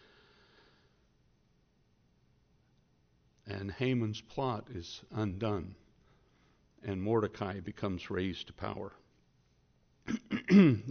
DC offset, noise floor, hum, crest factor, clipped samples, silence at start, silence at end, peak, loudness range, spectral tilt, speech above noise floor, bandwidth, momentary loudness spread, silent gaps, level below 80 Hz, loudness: under 0.1%; -71 dBFS; none; 24 dB; under 0.1%; 3.45 s; 0 s; -12 dBFS; 5 LU; -6.5 dB/octave; 39 dB; 6.6 kHz; 19 LU; none; -64 dBFS; -33 LUFS